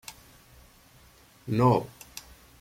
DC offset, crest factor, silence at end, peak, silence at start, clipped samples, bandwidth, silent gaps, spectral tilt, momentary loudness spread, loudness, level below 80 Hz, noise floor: under 0.1%; 20 dB; 0.4 s; -10 dBFS; 0.1 s; under 0.1%; 16.5 kHz; none; -7 dB/octave; 23 LU; -25 LUFS; -58 dBFS; -57 dBFS